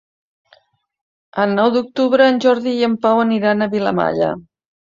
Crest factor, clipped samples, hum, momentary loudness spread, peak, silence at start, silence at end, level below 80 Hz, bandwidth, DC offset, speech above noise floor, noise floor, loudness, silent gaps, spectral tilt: 16 dB; under 0.1%; none; 7 LU; -2 dBFS; 1.35 s; 0.5 s; -58 dBFS; 7.6 kHz; under 0.1%; 39 dB; -55 dBFS; -16 LUFS; none; -6.5 dB/octave